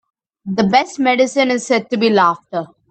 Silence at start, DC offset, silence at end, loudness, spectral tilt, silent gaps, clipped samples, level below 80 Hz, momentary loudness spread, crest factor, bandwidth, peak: 0.45 s; under 0.1%; 0.25 s; -16 LUFS; -4.5 dB/octave; none; under 0.1%; -62 dBFS; 12 LU; 16 dB; 9 kHz; 0 dBFS